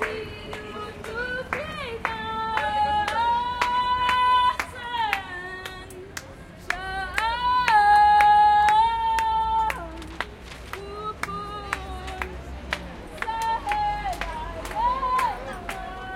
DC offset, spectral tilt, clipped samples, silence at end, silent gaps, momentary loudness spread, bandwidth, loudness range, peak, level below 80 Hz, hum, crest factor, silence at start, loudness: under 0.1%; -3.5 dB/octave; under 0.1%; 0 s; none; 19 LU; 16.5 kHz; 11 LU; -4 dBFS; -42 dBFS; none; 20 dB; 0 s; -24 LUFS